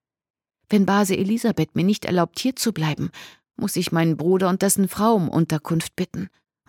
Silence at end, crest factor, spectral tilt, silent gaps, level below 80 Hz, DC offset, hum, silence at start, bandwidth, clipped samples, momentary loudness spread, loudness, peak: 0.4 s; 16 dB; -5.5 dB/octave; none; -58 dBFS; under 0.1%; none; 0.7 s; 18.5 kHz; under 0.1%; 10 LU; -21 LUFS; -6 dBFS